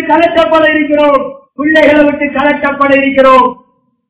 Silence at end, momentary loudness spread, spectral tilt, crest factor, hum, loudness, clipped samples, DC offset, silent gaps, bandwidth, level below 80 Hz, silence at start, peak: 0.55 s; 7 LU; -8 dB/octave; 8 dB; none; -8 LUFS; 4%; under 0.1%; none; 4 kHz; -42 dBFS; 0 s; 0 dBFS